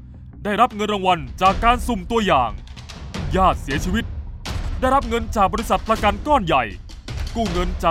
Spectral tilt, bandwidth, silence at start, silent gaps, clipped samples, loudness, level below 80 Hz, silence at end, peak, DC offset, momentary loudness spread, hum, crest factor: -5.5 dB/octave; 16 kHz; 0 s; none; under 0.1%; -20 LUFS; -30 dBFS; 0 s; -2 dBFS; under 0.1%; 14 LU; none; 18 dB